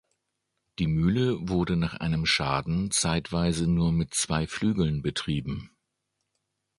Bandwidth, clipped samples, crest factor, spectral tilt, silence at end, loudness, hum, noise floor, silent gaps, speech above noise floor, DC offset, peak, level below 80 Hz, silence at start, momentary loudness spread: 11.5 kHz; under 0.1%; 18 dB; -5 dB/octave; 1.15 s; -27 LUFS; none; -80 dBFS; none; 54 dB; under 0.1%; -10 dBFS; -44 dBFS; 0.8 s; 6 LU